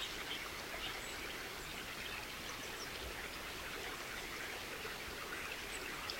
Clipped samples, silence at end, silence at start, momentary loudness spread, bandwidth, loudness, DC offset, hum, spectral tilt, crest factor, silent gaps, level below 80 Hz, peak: under 0.1%; 0 s; 0 s; 2 LU; 16.5 kHz; -44 LUFS; under 0.1%; none; -2 dB/octave; 20 dB; none; -60 dBFS; -24 dBFS